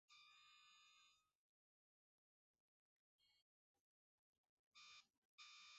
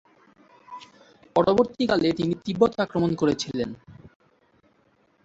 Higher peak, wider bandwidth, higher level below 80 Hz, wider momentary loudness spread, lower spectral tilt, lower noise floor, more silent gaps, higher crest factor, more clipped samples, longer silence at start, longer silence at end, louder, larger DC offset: second, -52 dBFS vs -6 dBFS; about the same, 7.6 kHz vs 8 kHz; second, under -90 dBFS vs -56 dBFS; second, 6 LU vs 22 LU; second, 4.5 dB/octave vs -6 dB/octave; first, under -90 dBFS vs -64 dBFS; first, 1.35-2.54 s, 2.60-3.19 s, 3.42-4.72 s, 5.17-5.38 s vs none; about the same, 22 dB vs 20 dB; neither; second, 0.1 s vs 0.7 s; second, 0 s vs 1.15 s; second, -66 LUFS vs -24 LUFS; neither